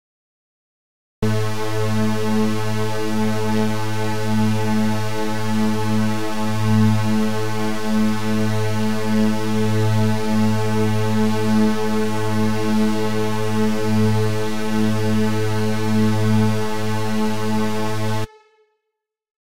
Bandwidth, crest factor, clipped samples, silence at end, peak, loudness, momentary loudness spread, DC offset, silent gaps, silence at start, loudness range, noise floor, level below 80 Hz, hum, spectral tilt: 16 kHz; 14 dB; under 0.1%; 0.1 s; -6 dBFS; -21 LUFS; 5 LU; 9%; 19.31-19.35 s; 1.2 s; 2 LU; -80 dBFS; -44 dBFS; none; -6.5 dB/octave